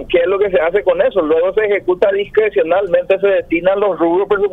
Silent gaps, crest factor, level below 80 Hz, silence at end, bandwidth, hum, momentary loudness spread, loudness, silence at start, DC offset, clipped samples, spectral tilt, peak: none; 14 dB; -44 dBFS; 0 s; 4 kHz; none; 1 LU; -14 LUFS; 0 s; under 0.1%; under 0.1%; -7.5 dB/octave; 0 dBFS